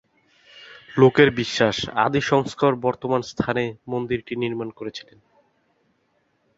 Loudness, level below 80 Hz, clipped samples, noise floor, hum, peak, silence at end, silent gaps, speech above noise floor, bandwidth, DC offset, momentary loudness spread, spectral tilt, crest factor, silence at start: -21 LUFS; -56 dBFS; under 0.1%; -68 dBFS; none; -2 dBFS; 1.55 s; none; 46 dB; 8 kHz; under 0.1%; 14 LU; -5.5 dB/octave; 22 dB; 0.55 s